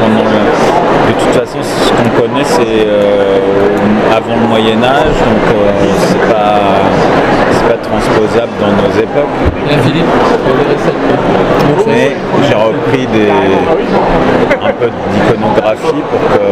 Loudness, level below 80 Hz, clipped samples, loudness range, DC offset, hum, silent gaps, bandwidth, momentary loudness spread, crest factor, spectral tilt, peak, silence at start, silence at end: -9 LUFS; -28 dBFS; 0.5%; 1 LU; under 0.1%; none; none; 15.5 kHz; 3 LU; 8 dB; -6 dB/octave; 0 dBFS; 0 s; 0 s